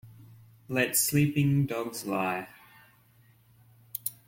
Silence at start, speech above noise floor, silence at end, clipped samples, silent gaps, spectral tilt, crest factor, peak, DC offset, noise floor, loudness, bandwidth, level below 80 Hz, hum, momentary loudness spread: 0.05 s; 34 dB; 0.15 s; under 0.1%; none; -4.5 dB/octave; 20 dB; -12 dBFS; under 0.1%; -61 dBFS; -28 LUFS; 16.5 kHz; -62 dBFS; none; 12 LU